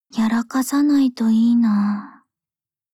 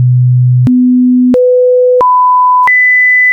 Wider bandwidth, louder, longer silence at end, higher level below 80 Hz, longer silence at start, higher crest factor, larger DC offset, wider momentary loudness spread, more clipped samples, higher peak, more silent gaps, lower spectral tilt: first, 15.5 kHz vs 3.3 kHz; second, -18 LUFS vs -6 LUFS; first, 0.85 s vs 0 s; second, -62 dBFS vs -48 dBFS; first, 0.15 s vs 0 s; first, 10 dB vs 4 dB; neither; about the same, 5 LU vs 4 LU; neither; second, -8 dBFS vs -4 dBFS; neither; second, -5.5 dB/octave vs -10.5 dB/octave